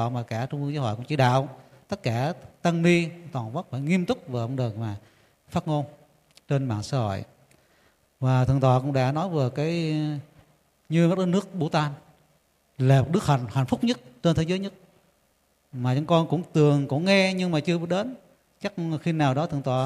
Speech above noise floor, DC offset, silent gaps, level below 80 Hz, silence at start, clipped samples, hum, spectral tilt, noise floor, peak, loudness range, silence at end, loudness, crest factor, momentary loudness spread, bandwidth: 43 dB; under 0.1%; none; -56 dBFS; 0 s; under 0.1%; none; -7 dB/octave; -67 dBFS; -6 dBFS; 6 LU; 0 s; -25 LUFS; 18 dB; 11 LU; 12 kHz